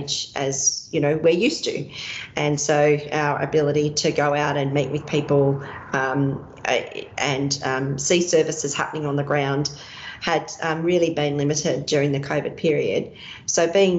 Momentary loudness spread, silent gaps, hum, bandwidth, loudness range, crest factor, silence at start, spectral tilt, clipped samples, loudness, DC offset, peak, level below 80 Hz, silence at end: 8 LU; none; none; 8.2 kHz; 2 LU; 16 dB; 0 s; -4 dB/octave; under 0.1%; -22 LUFS; under 0.1%; -6 dBFS; -56 dBFS; 0 s